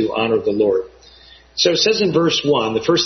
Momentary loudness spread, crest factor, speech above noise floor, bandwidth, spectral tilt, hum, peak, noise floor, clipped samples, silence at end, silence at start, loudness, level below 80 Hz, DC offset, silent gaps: 7 LU; 16 dB; 29 dB; 6.4 kHz; -4 dB/octave; none; -2 dBFS; -45 dBFS; under 0.1%; 0 s; 0 s; -17 LUFS; -52 dBFS; under 0.1%; none